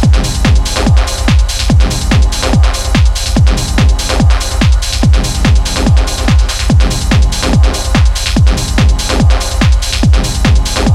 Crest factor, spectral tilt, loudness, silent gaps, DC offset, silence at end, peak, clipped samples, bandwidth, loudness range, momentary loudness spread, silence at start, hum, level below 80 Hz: 8 dB; -5 dB/octave; -11 LUFS; none; under 0.1%; 0 s; 0 dBFS; under 0.1%; 14.5 kHz; 0 LU; 1 LU; 0 s; none; -10 dBFS